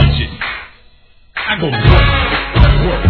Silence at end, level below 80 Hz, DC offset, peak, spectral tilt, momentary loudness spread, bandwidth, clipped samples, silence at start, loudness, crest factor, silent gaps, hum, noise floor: 0 s; -16 dBFS; under 0.1%; 0 dBFS; -8.5 dB/octave; 12 LU; 5.4 kHz; 0.6%; 0 s; -13 LUFS; 12 dB; none; none; -45 dBFS